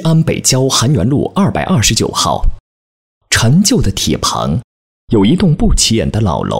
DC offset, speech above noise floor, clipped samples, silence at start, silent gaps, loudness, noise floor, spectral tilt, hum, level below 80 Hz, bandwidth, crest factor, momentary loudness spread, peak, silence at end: under 0.1%; over 79 dB; under 0.1%; 0 s; 2.60-3.21 s, 4.64-5.08 s; -12 LUFS; under -90 dBFS; -4.5 dB/octave; none; -24 dBFS; 16.5 kHz; 12 dB; 6 LU; 0 dBFS; 0 s